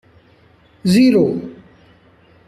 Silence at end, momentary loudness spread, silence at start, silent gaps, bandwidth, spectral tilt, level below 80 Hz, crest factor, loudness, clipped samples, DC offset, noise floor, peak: 0.95 s; 16 LU; 0.85 s; none; 14 kHz; -6.5 dB/octave; -54 dBFS; 16 dB; -15 LUFS; under 0.1%; under 0.1%; -51 dBFS; -4 dBFS